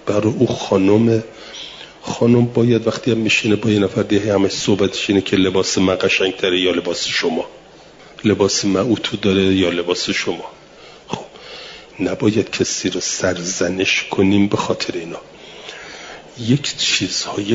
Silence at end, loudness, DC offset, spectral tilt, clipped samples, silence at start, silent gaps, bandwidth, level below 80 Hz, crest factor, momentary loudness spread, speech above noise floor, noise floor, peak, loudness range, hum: 0 s; -17 LUFS; under 0.1%; -4.5 dB/octave; under 0.1%; 0.05 s; none; 7.8 kHz; -54 dBFS; 16 dB; 18 LU; 26 dB; -42 dBFS; -2 dBFS; 4 LU; none